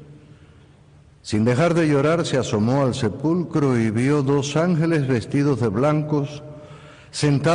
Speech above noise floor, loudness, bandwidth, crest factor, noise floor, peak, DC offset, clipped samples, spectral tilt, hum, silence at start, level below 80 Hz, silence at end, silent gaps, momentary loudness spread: 31 dB; -20 LUFS; 10.5 kHz; 12 dB; -50 dBFS; -10 dBFS; under 0.1%; under 0.1%; -6.5 dB/octave; none; 0 s; -52 dBFS; 0 s; none; 8 LU